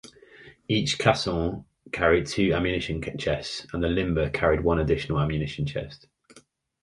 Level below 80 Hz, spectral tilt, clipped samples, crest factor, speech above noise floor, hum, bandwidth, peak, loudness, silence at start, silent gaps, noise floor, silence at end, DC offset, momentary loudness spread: -40 dBFS; -5.5 dB/octave; under 0.1%; 22 dB; 32 dB; none; 11.5 kHz; -4 dBFS; -26 LUFS; 0.05 s; none; -57 dBFS; 0.45 s; under 0.1%; 9 LU